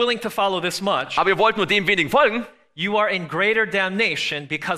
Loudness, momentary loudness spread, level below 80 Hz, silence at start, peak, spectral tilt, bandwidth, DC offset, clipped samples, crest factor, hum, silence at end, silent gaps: -20 LUFS; 6 LU; -58 dBFS; 0 s; -6 dBFS; -4 dB/octave; 14.5 kHz; under 0.1%; under 0.1%; 16 dB; none; 0 s; none